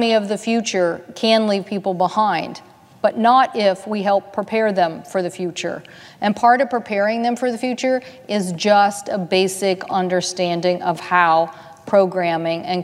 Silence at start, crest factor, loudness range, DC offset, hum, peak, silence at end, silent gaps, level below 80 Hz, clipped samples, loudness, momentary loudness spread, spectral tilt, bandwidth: 0 s; 18 dB; 2 LU; under 0.1%; none; 0 dBFS; 0 s; none; -70 dBFS; under 0.1%; -19 LUFS; 9 LU; -4.5 dB/octave; 14.5 kHz